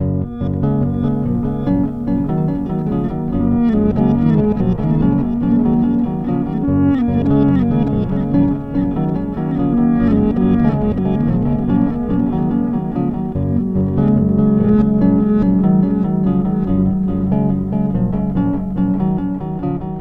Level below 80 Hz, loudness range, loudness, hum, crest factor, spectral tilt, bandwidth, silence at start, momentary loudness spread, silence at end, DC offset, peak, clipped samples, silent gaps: -30 dBFS; 3 LU; -16 LUFS; none; 14 dB; -11.5 dB/octave; 4.1 kHz; 0 s; 6 LU; 0 s; 0.1%; 0 dBFS; under 0.1%; none